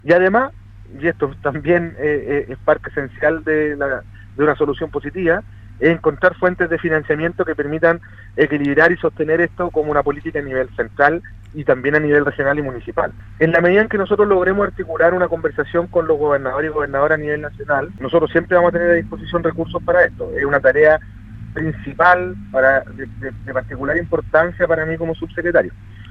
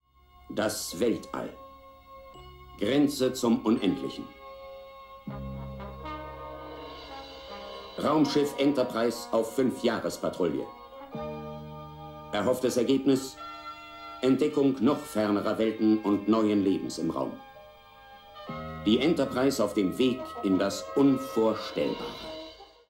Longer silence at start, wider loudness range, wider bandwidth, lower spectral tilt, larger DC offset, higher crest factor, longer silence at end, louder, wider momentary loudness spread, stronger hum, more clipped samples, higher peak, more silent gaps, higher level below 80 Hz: second, 0.05 s vs 0.45 s; second, 3 LU vs 6 LU; second, 6.4 kHz vs 16.5 kHz; first, -8.5 dB/octave vs -5.5 dB/octave; neither; about the same, 18 dB vs 18 dB; second, 0 s vs 0.25 s; first, -17 LUFS vs -28 LUFS; second, 10 LU vs 19 LU; neither; neither; first, 0 dBFS vs -12 dBFS; neither; first, -40 dBFS vs -56 dBFS